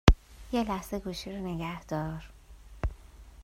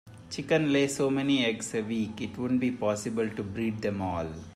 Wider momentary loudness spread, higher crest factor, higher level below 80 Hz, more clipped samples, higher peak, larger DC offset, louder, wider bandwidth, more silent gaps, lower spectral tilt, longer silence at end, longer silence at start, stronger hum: first, 21 LU vs 9 LU; first, 30 dB vs 16 dB; first, -34 dBFS vs -60 dBFS; neither; first, 0 dBFS vs -12 dBFS; neither; second, -34 LUFS vs -29 LUFS; first, 16 kHz vs 14.5 kHz; neither; about the same, -6 dB/octave vs -5 dB/octave; about the same, 0 s vs 0 s; about the same, 0.05 s vs 0.05 s; neither